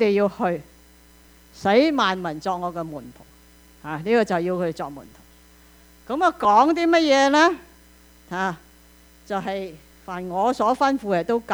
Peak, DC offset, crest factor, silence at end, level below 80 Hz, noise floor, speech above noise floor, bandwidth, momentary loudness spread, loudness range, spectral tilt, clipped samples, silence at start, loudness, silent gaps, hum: -4 dBFS; under 0.1%; 18 dB; 0 s; -54 dBFS; -51 dBFS; 30 dB; over 20 kHz; 18 LU; 7 LU; -5 dB/octave; under 0.1%; 0 s; -21 LUFS; none; none